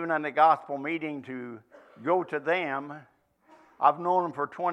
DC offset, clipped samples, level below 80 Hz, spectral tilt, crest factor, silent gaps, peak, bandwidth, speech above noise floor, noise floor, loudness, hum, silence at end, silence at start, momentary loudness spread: under 0.1%; under 0.1%; -84 dBFS; -7 dB/octave; 22 dB; none; -6 dBFS; 9.6 kHz; 33 dB; -60 dBFS; -27 LUFS; none; 0 s; 0 s; 18 LU